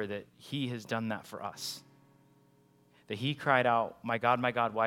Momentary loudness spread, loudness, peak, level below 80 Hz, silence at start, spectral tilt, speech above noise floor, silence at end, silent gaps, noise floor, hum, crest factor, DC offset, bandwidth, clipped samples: 14 LU; -32 LUFS; -10 dBFS; -76 dBFS; 0 s; -5 dB/octave; 33 dB; 0 s; none; -65 dBFS; 60 Hz at -65 dBFS; 22 dB; under 0.1%; 17 kHz; under 0.1%